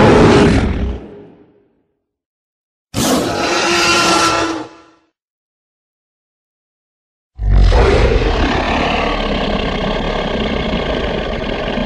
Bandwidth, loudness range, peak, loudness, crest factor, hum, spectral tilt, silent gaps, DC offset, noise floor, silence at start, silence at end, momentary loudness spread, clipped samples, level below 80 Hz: 14 kHz; 5 LU; 0 dBFS; -14 LUFS; 14 dB; none; -4.5 dB/octave; 2.26-2.87 s, 5.22-7.30 s; under 0.1%; -66 dBFS; 0 s; 0 s; 10 LU; under 0.1%; -22 dBFS